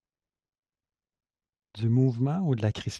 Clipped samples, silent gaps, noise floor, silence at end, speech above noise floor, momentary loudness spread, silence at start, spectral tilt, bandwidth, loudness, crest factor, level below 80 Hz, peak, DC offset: under 0.1%; none; under -90 dBFS; 0 s; over 64 dB; 4 LU; 1.75 s; -7.5 dB/octave; 9.8 kHz; -27 LUFS; 18 dB; -64 dBFS; -12 dBFS; under 0.1%